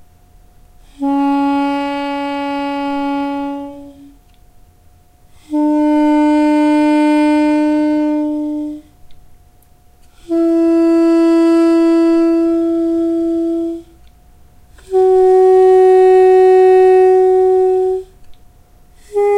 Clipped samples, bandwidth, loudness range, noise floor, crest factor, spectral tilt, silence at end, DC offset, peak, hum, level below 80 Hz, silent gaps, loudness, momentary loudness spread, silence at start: under 0.1%; 10 kHz; 10 LU; -47 dBFS; 12 dB; -5.5 dB/octave; 0 s; under 0.1%; -2 dBFS; none; -46 dBFS; none; -12 LUFS; 13 LU; 1 s